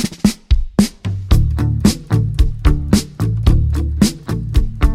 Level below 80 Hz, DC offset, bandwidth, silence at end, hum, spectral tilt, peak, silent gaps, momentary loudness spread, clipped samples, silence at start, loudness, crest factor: -18 dBFS; under 0.1%; 16 kHz; 0 s; none; -6 dB/octave; 0 dBFS; none; 4 LU; under 0.1%; 0 s; -17 LUFS; 14 dB